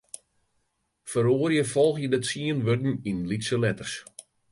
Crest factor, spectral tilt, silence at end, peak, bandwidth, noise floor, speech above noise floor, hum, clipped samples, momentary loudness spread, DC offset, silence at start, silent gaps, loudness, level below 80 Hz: 16 dB; -5.5 dB/octave; 0.3 s; -10 dBFS; 11.5 kHz; -74 dBFS; 49 dB; none; under 0.1%; 18 LU; under 0.1%; 1.05 s; none; -26 LUFS; -60 dBFS